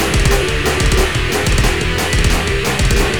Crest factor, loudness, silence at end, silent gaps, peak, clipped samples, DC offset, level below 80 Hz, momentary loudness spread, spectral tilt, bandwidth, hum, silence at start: 14 dB; -15 LUFS; 0 s; none; 0 dBFS; under 0.1%; 3%; -18 dBFS; 2 LU; -4 dB/octave; over 20 kHz; none; 0 s